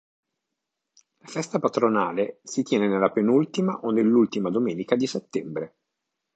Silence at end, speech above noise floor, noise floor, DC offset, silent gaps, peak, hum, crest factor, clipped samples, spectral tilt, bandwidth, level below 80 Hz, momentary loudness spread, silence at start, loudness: 0.7 s; 60 dB; -83 dBFS; under 0.1%; none; -6 dBFS; none; 20 dB; under 0.1%; -6 dB/octave; 8.8 kHz; -72 dBFS; 11 LU; 1.3 s; -24 LUFS